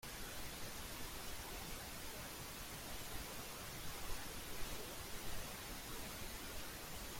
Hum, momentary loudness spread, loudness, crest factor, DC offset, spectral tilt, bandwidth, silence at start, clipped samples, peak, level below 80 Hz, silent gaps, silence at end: none; 1 LU; -48 LUFS; 16 dB; under 0.1%; -2.5 dB/octave; 16.5 kHz; 0 s; under 0.1%; -30 dBFS; -56 dBFS; none; 0 s